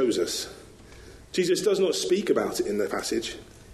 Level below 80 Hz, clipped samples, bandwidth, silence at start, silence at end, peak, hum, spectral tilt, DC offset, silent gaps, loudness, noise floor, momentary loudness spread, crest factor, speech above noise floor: -56 dBFS; under 0.1%; 13 kHz; 0 s; 0 s; -10 dBFS; none; -3.5 dB/octave; under 0.1%; none; -26 LUFS; -47 dBFS; 13 LU; 16 dB; 22 dB